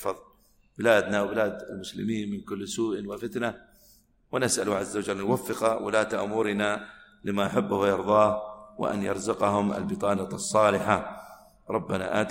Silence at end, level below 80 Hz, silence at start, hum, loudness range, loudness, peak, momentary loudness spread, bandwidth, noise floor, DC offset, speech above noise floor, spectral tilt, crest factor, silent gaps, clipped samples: 0 s; -60 dBFS; 0 s; none; 5 LU; -27 LUFS; -6 dBFS; 12 LU; 16.5 kHz; -60 dBFS; under 0.1%; 33 dB; -4.5 dB/octave; 20 dB; none; under 0.1%